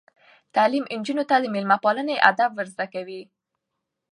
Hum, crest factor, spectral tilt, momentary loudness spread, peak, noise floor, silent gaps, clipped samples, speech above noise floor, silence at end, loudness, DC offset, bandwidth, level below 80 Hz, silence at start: none; 24 dB; -5 dB/octave; 12 LU; 0 dBFS; -81 dBFS; none; under 0.1%; 59 dB; 0.9 s; -22 LUFS; under 0.1%; 11 kHz; -78 dBFS; 0.55 s